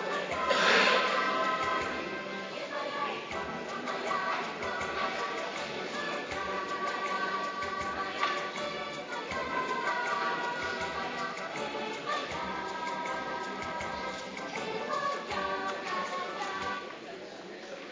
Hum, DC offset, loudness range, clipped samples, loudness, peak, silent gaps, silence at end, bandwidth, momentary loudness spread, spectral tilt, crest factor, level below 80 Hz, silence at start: none; under 0.1%; 5 LU; under 0.1%; -32 LUFS; -12 dBFS; none; 0 s; 7.6 kHz; 8 LU; -3 dB/octave; 22 dB; -62 dBFS; 0 s